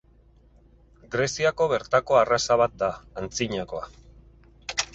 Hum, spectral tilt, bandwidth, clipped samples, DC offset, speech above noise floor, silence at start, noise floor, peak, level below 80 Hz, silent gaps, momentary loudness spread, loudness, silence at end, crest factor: none; -3.5 dB/octave; 8.4 kHz; under 0.1%; under 0.1%; 32 dB; 1.1 s; -56 dBFS; -6 dBFS; -52 dBFS; none; 15 LU; -24 LUFS; 0.1 s; 20 dB